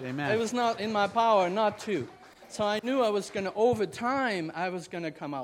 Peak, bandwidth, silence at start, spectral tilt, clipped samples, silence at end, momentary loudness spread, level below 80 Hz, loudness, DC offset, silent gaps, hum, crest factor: -12 dBFS; 16 kHz; 0 s; -5 dB/octave; under 0.1%; 0 s; 11 LU; -68 dBFS; -29 LUFS; under 0.1%; none; none; 16 dB